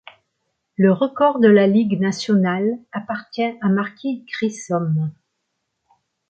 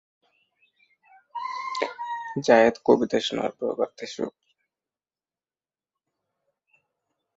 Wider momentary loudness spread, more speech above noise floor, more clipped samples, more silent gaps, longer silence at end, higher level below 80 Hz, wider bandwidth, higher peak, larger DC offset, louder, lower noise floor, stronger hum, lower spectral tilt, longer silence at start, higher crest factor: about the same, 14 LU vs 15 LU; second, 57 dB vs over 67 dB; neither; neither; second, 1.2 s vs 3.05 s; about the same, -66 dBFS vs -68 dBFS; about the same, 8.8 kHz vs 8 kHz; about the same, -2 dBFS vs -4 dBFS; neither; first, -19 LUFS vs -25 LUFS; second, -75 dBFS vs under -90 dBFS; neither; first, -7 dB/octave vs -4.5 dB/octave; second, 0.8 s vs 1.35 s; second, 16 dB vs 24 dB